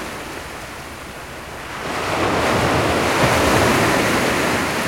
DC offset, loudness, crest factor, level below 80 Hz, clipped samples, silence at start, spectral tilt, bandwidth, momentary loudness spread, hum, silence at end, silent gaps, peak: 0.1%; -17 LUFS; 16 dB; -40 dBFS; under 0.1%; 0 s; -4 dB/octave; 16.5 kHz; 17 LU; none; 0 s; none; -4 dBFS